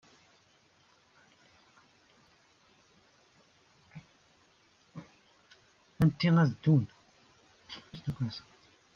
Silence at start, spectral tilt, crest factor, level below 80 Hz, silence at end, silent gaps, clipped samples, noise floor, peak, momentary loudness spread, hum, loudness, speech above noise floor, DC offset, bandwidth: 3.95 s; -8 dB/octave; 20 dB; -62 dBFS; 0.55 s; none; under 0.1%; -66 dBFS; -14 dBFS; 28 LU; none; -29 LUFS; 38 dB; under 0.1%; 6.8 kHz